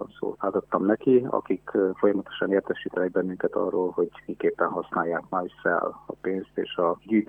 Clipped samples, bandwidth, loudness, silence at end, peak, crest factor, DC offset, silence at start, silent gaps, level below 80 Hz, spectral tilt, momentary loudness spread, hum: under 0.1%; 3.7 kHz; -26 LUFS; 0.05 s; -6 dBFS; 20 dB; under 0.1%; 0 s; none; -66 dBFS; -9 dB/octave; 8 LU; none